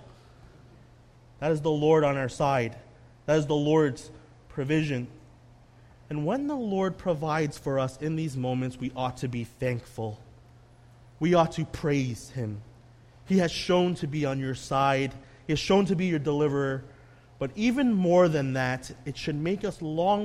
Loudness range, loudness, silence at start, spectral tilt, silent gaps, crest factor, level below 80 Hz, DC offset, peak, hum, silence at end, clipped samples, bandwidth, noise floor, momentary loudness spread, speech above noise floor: 5 LU; -27 LUFS; 0 s; -6.5 dB/octave; none; 18 dB; -54 dBFS; under 0.1%; -10 dBFS; none; 0 s; under 0.1%; 13.5 kHz; -54 dBFS; 12 LU; 28 dB